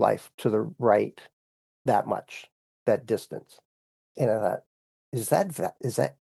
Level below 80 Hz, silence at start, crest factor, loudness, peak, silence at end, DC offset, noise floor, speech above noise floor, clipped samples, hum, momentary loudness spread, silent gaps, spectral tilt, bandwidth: -76 dBFS; 0 s; 22 dB; -27 LUFS; -6 dBFS; 0.25 s; under 0.1%; under -90 dBFS; over 64 dB; under 0.1%; none; 12 LU; 0.34-0.38 s, 1.33-1.85 s, 2.52-2.86 s, 3.65-4.15 s, 4.66-5.12 s; -6 dB/octave; 13 kHz